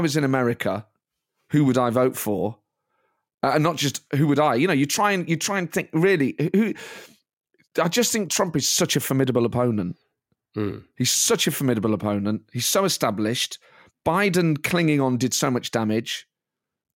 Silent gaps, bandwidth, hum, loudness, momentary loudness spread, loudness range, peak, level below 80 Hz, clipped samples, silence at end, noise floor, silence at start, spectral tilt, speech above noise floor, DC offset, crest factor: 3.34-3.38 s, 7.33-7.37 s; 17 kHz; none; -22 LUFS; 10 LU; 2 LU; -6 dBFS; -62 dBFS; under 0.1%; 0.75 s; -86 dBFS; 0 s; -4 dB/octave; 64 dB; under 0.1%; 18 dB